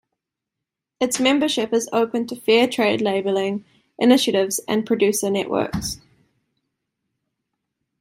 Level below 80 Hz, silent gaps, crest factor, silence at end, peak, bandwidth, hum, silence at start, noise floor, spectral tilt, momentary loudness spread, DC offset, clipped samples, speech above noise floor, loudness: -54 dBFS; none; 18 dB; 2.05 s; -2 dBFS; 16 kHz; none; 1 s; -84 dBFS; -3.5 dB/octave; 9 LU; under 0.1%; under 0.1%; 65 dB; -20 LUFS